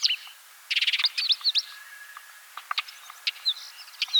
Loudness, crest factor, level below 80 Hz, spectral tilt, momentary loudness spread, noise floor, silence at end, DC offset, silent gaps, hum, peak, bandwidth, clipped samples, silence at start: -25 LUFS; 18 dB; under -90 dBFS; 8.5 dB/octave; 21 LU; -48 dBFS; 0 s; under 0.1%; none; none; -10 dBFS; over 20 kHz; under 0.1%; 0 s